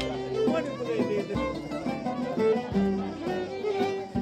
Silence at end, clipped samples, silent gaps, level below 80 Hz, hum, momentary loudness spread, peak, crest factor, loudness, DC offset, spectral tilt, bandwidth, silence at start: 0 s; under 0.1%; none; -52 dBFS; none; 6 LU; -12 dBFS; 16 dB; -29 LUFS; under 0.1%; -7 dB/octave; 13 kHz; 0 s